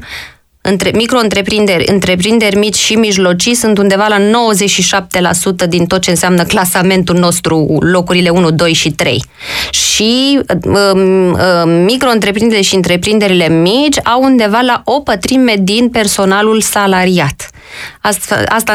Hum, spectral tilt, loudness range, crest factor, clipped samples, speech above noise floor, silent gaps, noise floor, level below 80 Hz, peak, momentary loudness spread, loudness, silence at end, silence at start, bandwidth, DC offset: none; -4 dB/octave; 1 LU; 10 dB; under 0.1%; 21 dB; none; -30 dBFS; -38 dBFS; 0 dBFS; 4 LU; -9 LUFS; 0 s; 0 s; 16.5 kHz; under 0.1%